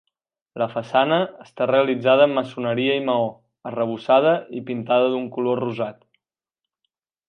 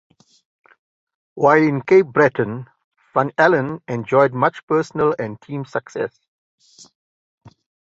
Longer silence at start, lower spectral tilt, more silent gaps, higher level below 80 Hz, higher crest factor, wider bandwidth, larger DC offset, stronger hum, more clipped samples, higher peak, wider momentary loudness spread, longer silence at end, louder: second, 0.55 s vs 1.35 s; about the same, -7.5 dB/octave vs -7.5 dB/octave; second, none vs 2.84-2.92 s, 4.63-4.68 s; second, -72 dBFS vs -62 dBFS; about the same, 18 dB vs 18 dB; second, 6.4 kHz vs 7.8 kHz; neither; neither; neither; about the same, -4 dBFS vs -2 dBFS; about the same, 12 LU vs 13 LU; second, 1.35 s vs 1.75 s; second, -21 LUFS vs -18 LUFS